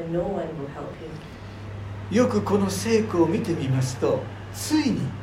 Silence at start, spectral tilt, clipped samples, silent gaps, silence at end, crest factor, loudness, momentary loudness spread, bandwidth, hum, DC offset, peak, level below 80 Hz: 0 s; -6 dB/octave; under 0.1%; none; 0 s; 18 dB; -24 LUFS; 16 LU; 16 kHz; none; under 0.1%; -6 dBFS; -50 dBFS